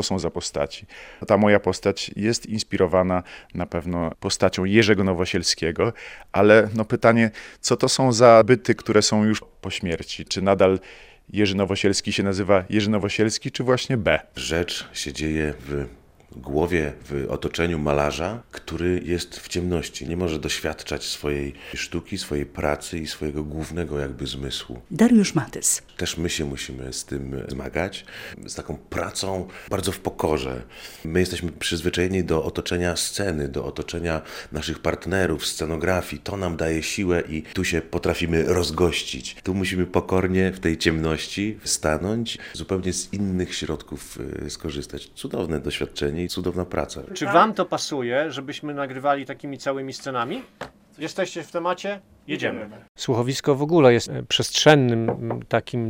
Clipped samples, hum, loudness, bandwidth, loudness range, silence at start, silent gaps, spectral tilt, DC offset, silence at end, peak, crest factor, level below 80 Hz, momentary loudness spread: under 0.1%; none; -23 LUFS; 16.5 kHz; 9 LU; 0 s; 52.89-52.95 s; -4.5 dB/octave; under 0.1%; 0 s; 0 dBFS; 22 dB; -46 dBFS; 13 LU